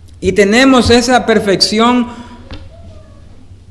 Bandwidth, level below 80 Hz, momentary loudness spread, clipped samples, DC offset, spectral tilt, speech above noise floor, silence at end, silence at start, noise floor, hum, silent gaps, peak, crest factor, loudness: 12 kHz; -36 dBFS; 14 LU; 0.6%; under 0.1%; -4 dB/octave; 26 dB; 0.7 s; 0.05 s; -35 dBFS; none; none; 0 dBFS; 12 dB; -10 LUFS